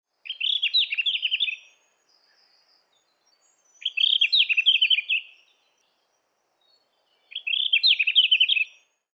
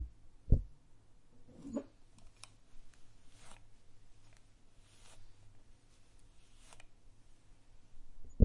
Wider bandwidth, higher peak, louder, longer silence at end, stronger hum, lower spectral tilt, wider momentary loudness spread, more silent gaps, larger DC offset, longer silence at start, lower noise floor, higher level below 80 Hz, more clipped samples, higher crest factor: second, 8 kHz vs 11.5 kHz; about the same, -8 dBFS vs -10 dBFS; first, -20 LUFS vs -41 LUFS; first, 0.5 s vs 0 s; neither; second, 6 dB/octave vs -8 dB/octave; second, 12 LU vs 27 LU; neither; neither; first, 0.25 s vs 0 s; first, -72 dBFS vs -60 dBFS; second, under -90 dBFS vs -48 dBFS; neither; second, 18 dB vs 30 dB